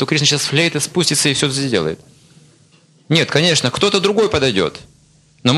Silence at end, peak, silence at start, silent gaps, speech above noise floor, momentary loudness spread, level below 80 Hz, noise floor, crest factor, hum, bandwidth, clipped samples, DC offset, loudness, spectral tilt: 0 s; 0 dBFS; 0 s; none; 35 dB; 6 LU; -50 dBFS; -51 dBFS; 18 dB; none; 14 kHz; under 0.1%; under 0.1%; -15 LUFS; -3.5 dB/octave